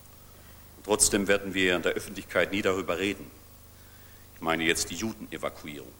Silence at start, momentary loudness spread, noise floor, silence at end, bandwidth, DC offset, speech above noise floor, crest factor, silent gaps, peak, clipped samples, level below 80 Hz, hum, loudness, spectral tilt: 0.05 s; 14 LU; -51 dBFS; 0.05 s; over 20 kHz; under 0.1%; 23 dB; 22 dB; none; -8 dBFS; under 0.1%; -52 dBFS; 50 Hz at -55 dBFS; -27 LUFS; -2.5 dB/octave